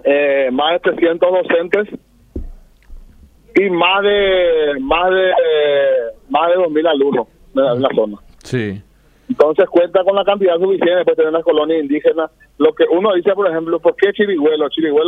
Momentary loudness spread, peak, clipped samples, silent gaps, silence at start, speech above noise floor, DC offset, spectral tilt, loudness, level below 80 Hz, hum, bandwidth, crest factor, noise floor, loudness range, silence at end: 9 LU; 0 dBFS; under 0.1%; none; 0.05 s; 30 dB; under 0.1%; -6.5 dB/octave; -15 LUFS; -42 dBFS; none; 7.4 kHz; 14 dB; -44 dBFS; 3 LU; 0 s